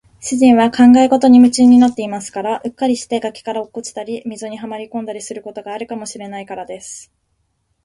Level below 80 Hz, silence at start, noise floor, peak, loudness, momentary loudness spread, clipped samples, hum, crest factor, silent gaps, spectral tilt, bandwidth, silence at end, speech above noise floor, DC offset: -54 dBFS; 0.2 s; -66 dBFS; 0 dBFS; -13 LUFS; 19 LU; under 0.1%; none; 14 dB; none; -4.5 dB/octave; 11.5 kHz; 0.85 s; 52 dB; under 0.1%